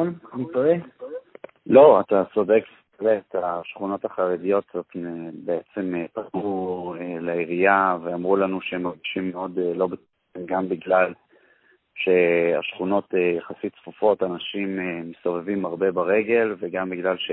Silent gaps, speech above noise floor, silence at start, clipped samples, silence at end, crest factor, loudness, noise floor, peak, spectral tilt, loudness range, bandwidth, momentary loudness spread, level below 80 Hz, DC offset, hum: none; 38 dB; 0 s; under 0.1%; 0 s; 22 dB; -23 LUFS; -61 dBFS; 0 dBFS; -10.5 dB/octave; 7 LU; 4.1 kHz; 14 LU; -64 dBFS; under 0.1%; none